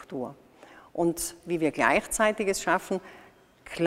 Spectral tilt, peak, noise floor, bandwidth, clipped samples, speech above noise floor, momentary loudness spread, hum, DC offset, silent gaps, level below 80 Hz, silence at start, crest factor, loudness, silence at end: -4 dB/octave; -6 dBFS; -53 dBFS; 16 kHz; under 0.1%; 25 dB; 14 LU; none; under 0.1%; none; -56 dBFS; 0 s; 22 dB; -27 LUFS; 0 s